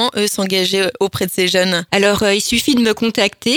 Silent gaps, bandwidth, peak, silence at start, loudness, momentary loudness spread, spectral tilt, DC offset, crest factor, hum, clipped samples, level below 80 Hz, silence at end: none; over 20 kHz; 0 dBFS; 0 s; -15 LUFS; 4 LU; -3 dB/octave; under 0.1%; 16 dB; none; under 0.1%; -48 dBFS; 0 s